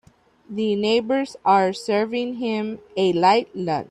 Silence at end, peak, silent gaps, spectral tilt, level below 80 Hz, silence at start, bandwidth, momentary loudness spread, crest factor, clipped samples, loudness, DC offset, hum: 0.05 s; -4 dBFS; none; -5.5 dB/octave; -64 dBFS; 0.5 s; 11 kHz; 8 LU; 16 dB; under 0.1%; -21 LUFS; under 0.1%; none